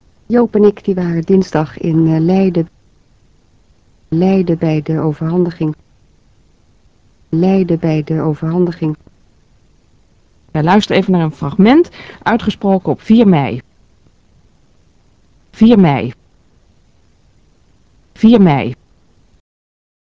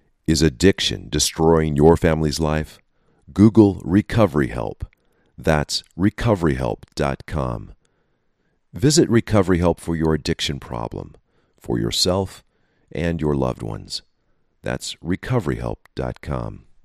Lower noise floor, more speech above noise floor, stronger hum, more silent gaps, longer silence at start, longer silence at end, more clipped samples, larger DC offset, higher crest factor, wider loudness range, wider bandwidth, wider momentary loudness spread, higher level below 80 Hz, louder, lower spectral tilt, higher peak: second, -52 dBFS vs -66 dBFS; second, 40 dB vs 47 dB; neither; neither; about the same, 0.3 s vs 0.3 s; first, 1.4 s vs 0.25 s; neither; first, 0.2% vs under 0.1%; second, 14 dB vs 20 dB; second, 4 LU vs 8 LU; second, 7.4 kHz vs 15 kHz; second, 11 LU vs 15 LU; second, -44 dBFS vs -36 dBFS; first, -13 LUFS vs -20 LUFS; first, -8.5 dB/octave vs -5.5 dB/octave; about the same, 0 dBFS vs 0 dBFS